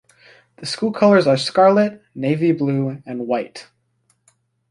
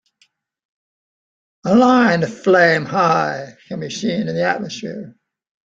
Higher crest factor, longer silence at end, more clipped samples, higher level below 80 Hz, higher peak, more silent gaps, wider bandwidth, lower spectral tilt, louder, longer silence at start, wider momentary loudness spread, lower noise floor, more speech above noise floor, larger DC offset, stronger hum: about the same, 18 dB vs 18 dB; first, 1.1 s vs 0.65 s; neither; about the same, -64 dBFS vs -60 dBFS; about the same, -2 dBFS vs -2 dBFS; neither; first, 11.5 kHz vs 7.6 kHz; about the same, -6.5 dB/octave vs -5.5 dB/octave; about the same, -18 LUFS vs -16 LUFS; second, 0.6 s vs 1.65 s; about the same, 15 LU vs 17 LU; first, -65 dBFS vs -61 dBFS; about the same, 48 dB vs 45 dB; neither; neither